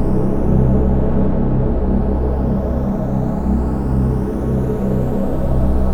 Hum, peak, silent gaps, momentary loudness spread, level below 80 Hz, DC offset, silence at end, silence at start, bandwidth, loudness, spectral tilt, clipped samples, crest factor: none; -2 dBFS; none; 4 LU; -20 dBFS; under 0.1%; 0 s; 0 s; 3.8 kHz; -18 LUFS; -10.5 dB/octave; under 0.1%; 12 dB